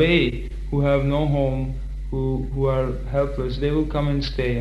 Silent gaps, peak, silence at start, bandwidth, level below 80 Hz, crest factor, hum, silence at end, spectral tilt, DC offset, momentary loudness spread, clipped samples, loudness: none; -4 dBFS; 0 s; 7.4 kHz; -30 dBFS; 16 dB; none; 0 s; -8 dB/octave; under 0.1%; 8 LU; under 0.1%; -23 LUFS